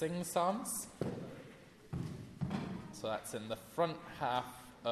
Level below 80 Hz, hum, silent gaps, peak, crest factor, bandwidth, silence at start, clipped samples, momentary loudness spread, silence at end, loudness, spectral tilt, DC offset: -64 dBFS; none; none; -20 dBFS; 20 dB; 14 kHz; 0 s; under 0.1%; 13 LU; 0 s; -40 LUFS; -4.5 dB/octave; under 0.1%